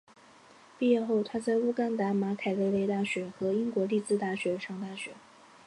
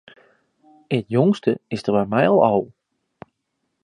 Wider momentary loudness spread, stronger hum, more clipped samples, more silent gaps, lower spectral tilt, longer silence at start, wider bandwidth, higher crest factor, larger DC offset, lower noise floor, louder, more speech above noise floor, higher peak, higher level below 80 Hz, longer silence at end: about the same, 9 LU vs 10 LU; neither; neither; neither; second, -6.5 dB/octave vs -8 dB/octave; about the same, 0.8 s vs 0.9 s; about the same, 11 kHz vs 10.5 kHz; about the same, 16 dB vs 20 dB; neither; second, -56 dBFS vs -75 dBFS; second, -30 LUFS vs -20 LUFS; second, 27 dB vs 56 dB; second, -14 dBFS vs -2 dBFS; second, -74 dBFS vs -60 dBFS; second, 0.45 s vs 1.2 s